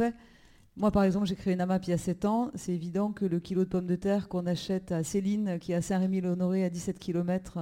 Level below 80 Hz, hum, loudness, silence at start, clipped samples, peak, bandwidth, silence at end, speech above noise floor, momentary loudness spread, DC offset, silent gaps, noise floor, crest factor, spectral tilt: -54 dBFS; none; -30 LUFS; 0 s; under 0.1%; -14 dBFS; 13.5 kHz; 0 s; 29 dB; 4 LU; under 0.1%; none; -58 dBFS; 16 dB; -7 dB/octave